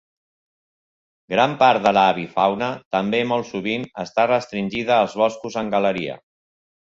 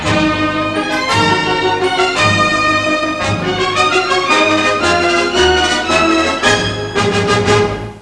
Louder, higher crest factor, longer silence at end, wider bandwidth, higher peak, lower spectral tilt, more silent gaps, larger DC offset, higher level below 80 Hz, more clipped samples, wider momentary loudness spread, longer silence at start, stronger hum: second, -20 LUFS vs -13 LUFS; first, 20 dB vs 14 dB; first, 0.8 s vs 0 s; second, 7.8 kHz vs 11 kHz; about the same, -2 dBFS vs 0 dBFS; first, -5.5 dB/octave vs -4 dB/octave; first, 2.85-2.91 s vs none; neither; second, -60 dBFS vs -36 dBFS; neither; first, 10 LU vs 5 LU; first, 1.3 s vs 0 s; neither